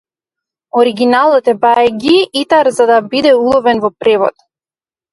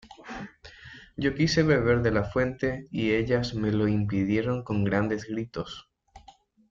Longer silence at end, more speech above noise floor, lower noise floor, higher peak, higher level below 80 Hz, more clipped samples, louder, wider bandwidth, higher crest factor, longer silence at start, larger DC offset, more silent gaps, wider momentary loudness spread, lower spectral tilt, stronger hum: first, 0.85 s vs 0.5 s; first, over 80 dB vs 30 dB; first, under -90 dBFS vs -56 dBFS; first, 0 dBFS vs -10 dBFS; about the same, -52 dBFS vs -48 dBFS; neither; first, -11 LUFS vs -26 LUFS; first, 11.5 kHz vs 7.6 kHz; second, 12 dB vs 18 dB; first, 0.75 s vs 0.05 s; neither; neither; second, 4 LU vs 19 LU; second, -4.5 dB/octave vs -6.5 dB/octave; neither